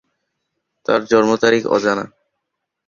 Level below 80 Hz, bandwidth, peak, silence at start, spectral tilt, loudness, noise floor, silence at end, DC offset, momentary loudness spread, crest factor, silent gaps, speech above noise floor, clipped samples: -58 dBFS; 7.4 kHz; 0 dBFS; 0.9 s; -4.5 dB/octave; -16 LUFS; -77 dBFS; 0.8 s; under 0.1%; 12 LU; 18 dB; none; 62 dB; under 0.1%